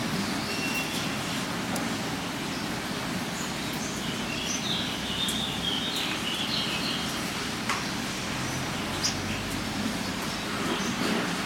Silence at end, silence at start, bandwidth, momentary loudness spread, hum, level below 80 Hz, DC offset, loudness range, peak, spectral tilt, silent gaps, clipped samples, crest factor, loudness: 0 s; 0 s; 16.5 kHz; 4 LU; none; -50 dBFS; under 0.1%; 3 LU; -12 dBFS; -3 dB/octave; none; under 0.1%; 18 dB; -29 LUFS